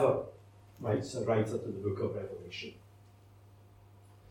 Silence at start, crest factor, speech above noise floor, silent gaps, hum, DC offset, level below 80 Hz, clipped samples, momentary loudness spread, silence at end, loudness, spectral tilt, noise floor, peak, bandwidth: 0 s; 20 dB; 24 dB; none; none; under 0.1%; -68 dBFS; under 0.1%; 16 LU; 0.15 s; -35 LUFS; -6.5 dB/octave; -58 dBFS; -16 dBFS; 13.5 kHz